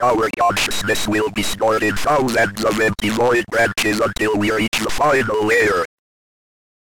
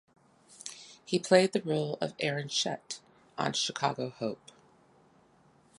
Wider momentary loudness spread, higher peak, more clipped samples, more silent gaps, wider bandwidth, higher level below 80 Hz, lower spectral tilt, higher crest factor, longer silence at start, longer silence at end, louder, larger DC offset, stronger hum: second, 3 LU vs 20 LU; about the same, -6 dBFS vs -8 dBFS; neither; first, 4.68-4.72 s vs none; first, 18 kHz vs 11.5 kHz; first, -42 dBFS vs -76 dBFS; about the same, -4 dB/octave vs -4 dB/octave; second, 12 dB vs 24 dB; second, 0 s vs 0.5 s; second, 1 s vs 1.45 s; first, -17 LUFS vs -30 LUFS; neither; neither